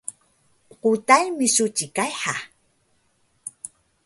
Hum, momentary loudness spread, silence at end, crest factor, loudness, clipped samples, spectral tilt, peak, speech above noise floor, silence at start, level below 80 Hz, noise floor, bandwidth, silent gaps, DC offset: none; 22 LU; 0.4 s; 22 dB; -21 LUFS; under 0.1%; -2 dB/octave; -2 dBFS; 45 dB; 0.1 s; -70 dBFS; -66 dBFS; 12 kHz; none; under 0.1%